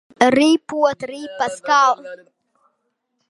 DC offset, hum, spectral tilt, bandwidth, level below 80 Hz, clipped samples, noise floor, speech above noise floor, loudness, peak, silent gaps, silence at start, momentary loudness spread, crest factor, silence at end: under 0.1%; none; -3.5 dB/octave; 11.5 kHz; -64 dBFS; under 0.1%; -72 dBFS; 54 dB; -17 LUFS; 0 dBFS; none; 0.2 s; 15 LU; 20 dB; 1.15 s